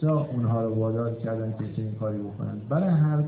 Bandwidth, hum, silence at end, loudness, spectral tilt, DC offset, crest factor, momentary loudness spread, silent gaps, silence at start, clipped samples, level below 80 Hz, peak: 4 kHz; none; 0 s; -27 LUFS; -13.5 dB/octave; under 0.1%; 12 dB; 9 LU; none; 0 s; under 0.1%; -56 dBFS; -14 dBFS